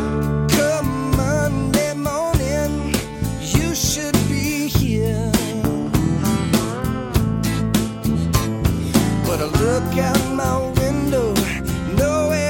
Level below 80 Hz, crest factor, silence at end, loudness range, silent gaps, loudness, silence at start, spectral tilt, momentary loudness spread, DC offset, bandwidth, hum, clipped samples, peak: -30 dBFS; 18 dB; 0 s; 1 LU; none; -20 LUFS; 0 s; -5.5 dB/octave; 4 LU; under 0.1%; 17 kHz; none; under 0.1%; 0 dBFS